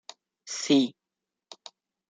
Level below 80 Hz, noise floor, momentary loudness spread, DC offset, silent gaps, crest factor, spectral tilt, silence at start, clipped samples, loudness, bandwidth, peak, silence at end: -80 dBFS; -88 dBFS; 25 LU; under 0.1%; none; 22 dB; -3.5 dB/octave; 0.45 s; under 0.1%; -26 LUFS; 9.4 kHz; -10 dBFS; 1.2 s